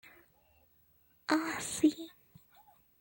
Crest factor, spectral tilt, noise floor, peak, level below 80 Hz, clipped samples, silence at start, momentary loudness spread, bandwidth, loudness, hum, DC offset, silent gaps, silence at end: 22 dB; -3 dB/octave; -68 dBFS; -14 dBFS; -72 dBFS; under 0.1%; 1.3 s; 17 LU; 17 kHz; -33 LUFS; none; under 0.1%; none; 0.9 s